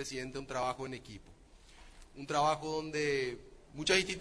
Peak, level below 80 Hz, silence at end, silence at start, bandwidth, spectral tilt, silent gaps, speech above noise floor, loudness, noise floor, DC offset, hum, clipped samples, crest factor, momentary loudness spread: -14 dBFS; -58 dBFS; 0 s; 0 s; 11 kHz; -3.5 dB/octave; none; 22 dB; -34 LUFS; -58 dBFS; under 0.1%; none; under 0.1%; 22 dB; 21 LU